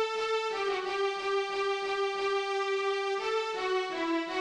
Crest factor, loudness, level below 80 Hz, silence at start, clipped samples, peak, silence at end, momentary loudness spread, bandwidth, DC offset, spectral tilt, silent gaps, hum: 10 dB; -31 LUFS; -70 dBFS; 0 s; under 0.1%; -20 dBFS; 0 s; 1 LU; 10.5 kHz; under 0.1%; -2 dB/octave; none; none